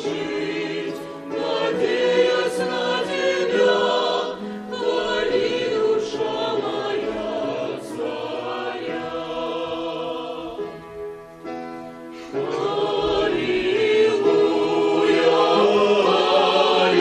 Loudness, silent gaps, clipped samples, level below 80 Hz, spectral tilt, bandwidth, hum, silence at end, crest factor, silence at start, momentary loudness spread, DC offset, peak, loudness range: -21 LUFS; none; under 0.1%; -56 dBFS; -4.5 dB/octave; 11.5 kHz; none; 0 s; 16 dB; 0 s; 14 LU; under 0.1%; -6 dBFS; 11 LU